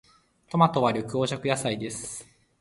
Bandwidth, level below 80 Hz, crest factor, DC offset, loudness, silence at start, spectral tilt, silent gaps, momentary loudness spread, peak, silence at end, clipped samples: 11.5 kHz; -62 dBFS; 22 dB; under 0.1%; -26 LUFS; 0.5 s; -5 dB/octave; none; 14 LU; -6 dBFS; 0.35 s; under 0.1%